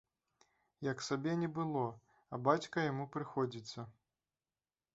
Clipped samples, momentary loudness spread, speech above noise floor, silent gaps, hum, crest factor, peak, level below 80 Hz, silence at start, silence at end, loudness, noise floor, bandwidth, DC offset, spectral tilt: under 0.1%; 14 LU; over 52 dB; none; none; 24 dB; -16 dBFS; -78 dBFS; 0.8 s; 1.05 s; -38 LUFS; under -90 dBFS; 8 kHz; under 0.1%; -5.5 dB/octave